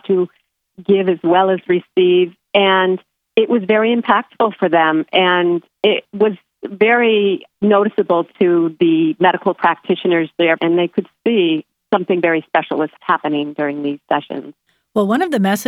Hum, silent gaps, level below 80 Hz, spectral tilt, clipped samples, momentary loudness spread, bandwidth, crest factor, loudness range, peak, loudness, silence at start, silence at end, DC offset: none; none; -68 dBFS; -6 dB/octave; under 0.1%; 7 LU; 15 kHz; 16 dB; 3 LU; 0 dBFS; -16 LUFS; 0.1 s; 0.05 s; under 0.1%